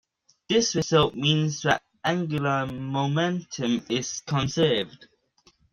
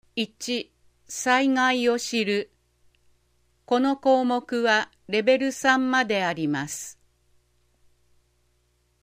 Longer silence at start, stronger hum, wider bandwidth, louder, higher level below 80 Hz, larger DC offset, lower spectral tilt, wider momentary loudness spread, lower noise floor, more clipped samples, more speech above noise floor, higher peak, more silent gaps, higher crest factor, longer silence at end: first, 0.5 s vs 0.15 s; second, none vs 60 Hz at -55 dBFS; second, 7.6 kHz vs 15.5 kHz; about the same, -25 LUFS vs -24 LUFS; first, -56 dBFS vs -68 dBFS; neither; about the same, -4.5 dB/octave vs -3.5 dB/octave; second, 6 LU vs 10 LU; second, -62 dBFS vs -68 dBFS; neither; second, 38 dB vs 45 dB; about the same, -6 dBFS vs -6 dBFS; neither; about the same, 20 dB vs 20 dB; second, 0.85 s vs 2.15 s